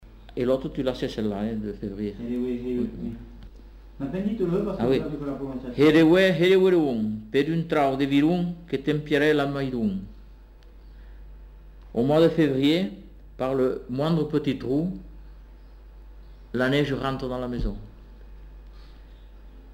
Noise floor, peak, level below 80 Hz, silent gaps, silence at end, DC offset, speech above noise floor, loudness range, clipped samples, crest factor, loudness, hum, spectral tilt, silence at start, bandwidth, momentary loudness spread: -47 dBFS; -8 dBFS; -44 dBFS; none; 0 s; under 0.1%; 24 dB; 9 LU; under 0.1%; 16 dB; -24 LUFS; none; -7.5 dB/octave; 0 s; 16 kHz; 14 LU